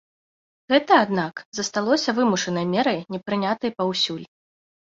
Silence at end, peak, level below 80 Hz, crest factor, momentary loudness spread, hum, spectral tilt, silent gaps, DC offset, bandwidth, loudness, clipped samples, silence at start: 0.65 s; -4 dBFS; -66 dBFS; 20 dB; 10 LU; none; -4 dB/octave; 1.45-1.52 s; under 0.1%; 7.8 kHz; -22 LUFS; under 0.1%; 0.7 s